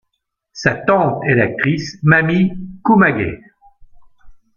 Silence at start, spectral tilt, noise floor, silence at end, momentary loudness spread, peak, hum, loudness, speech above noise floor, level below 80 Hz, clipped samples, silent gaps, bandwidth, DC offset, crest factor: 0.55 s; -7 dB/octave; -73 dBFS; 0.25 s; 9 LU; -2 dBFS; none; -15 LUFS; 58 dB; -46 dBFS; under 0.1%; none; 7.2 kHz; under 0.1%; 16 dB